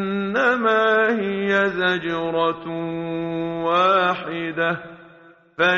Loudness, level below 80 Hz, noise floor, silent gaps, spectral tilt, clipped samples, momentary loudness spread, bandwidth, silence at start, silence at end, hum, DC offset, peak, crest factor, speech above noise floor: -21 LUFS; -60 dBFS; -50 dBFS; none; -3 dB/octave; under 0.1%; 10 LU; 7.4 kHz; 0 s; 0 s; none; under 0.1%; -4 dBFS; 16 dB; 29 dB